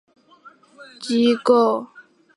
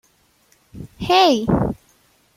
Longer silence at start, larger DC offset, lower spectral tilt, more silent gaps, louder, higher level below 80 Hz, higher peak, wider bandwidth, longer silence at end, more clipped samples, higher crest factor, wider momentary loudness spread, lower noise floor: about the same, 0.8 s vs 0.75 s; neither; about the same, -5 dB/octave vs -5.5 dB/octave; neither; about the same, -19 LUFS vs -17 LUFS; second, -74 dBFS vs -42 dBFS; about the same, -2 dBFS vs -2 dBFS; second, 11 kHz vs 16 kHz; second, 0.5 s vs 0.65 s; neither; about the same, 18 dB vs 20 dB; second, 18 LU vs 24 LU; second, -50 dBFS vs -59 dBFS